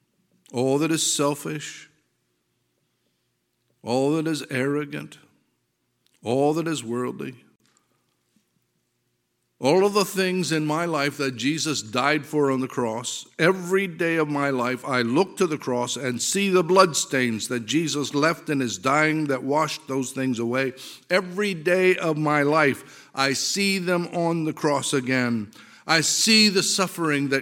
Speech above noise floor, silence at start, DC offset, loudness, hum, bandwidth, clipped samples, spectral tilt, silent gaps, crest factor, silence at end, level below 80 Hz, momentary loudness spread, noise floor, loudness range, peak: 50 dB; 0.55 s; under 0.1%; -23 LUFS; none; 17 kHz; under 0.1%; -3.5 dB/octave; none; 22 dB; 0 s; -74 dBFS; 10 LU; -73 dBFS; 8 LU; -2 dBFS